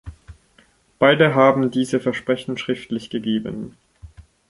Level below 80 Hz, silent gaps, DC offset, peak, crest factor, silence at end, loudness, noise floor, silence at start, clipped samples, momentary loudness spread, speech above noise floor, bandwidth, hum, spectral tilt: -50 dBFS; none; under 0.1%; -2 dBFS; 20 dB; 0.3 s; -19 LUFS; -57 dBFS; 0.05 s; under 0.1%; 13 LU; 38 dB; 11.5 kHz; none; -6 dB/octave